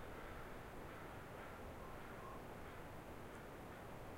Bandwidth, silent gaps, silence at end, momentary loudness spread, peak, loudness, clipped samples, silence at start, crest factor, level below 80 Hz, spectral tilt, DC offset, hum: 16 kHz; none; 0 s; 1 LU; -40 dBFS; -54 LUFS; under 0.1%; 0 s; 12 dB; -60 dBFS; -5.5 dB/octave; under 0.1%; none